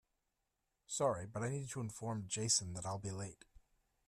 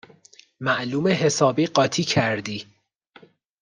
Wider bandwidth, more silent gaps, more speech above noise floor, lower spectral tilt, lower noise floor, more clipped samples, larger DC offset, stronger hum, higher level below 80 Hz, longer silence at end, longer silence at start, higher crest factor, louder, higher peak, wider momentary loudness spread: first, 14.5 kHz vs 10.5 kHz; neither; first, 46 dB vs 34 dB; about the same, -3.5 dB/octave vs -4.5 dB/octave; first, -87 dBFS vs -55 dBFS; neither; neither; neither; second, -70 dBFS vs -64 dBFS; second, 0.5 s vs 1 s; first, 0.9 s vs 0.6 s; about the same, 22 dB vs 20 dB; second, -40 LUFS vs -22 LUFS; second, -20 dBFS vs -4 dBFS; about the same, 11 LU vs 10 LU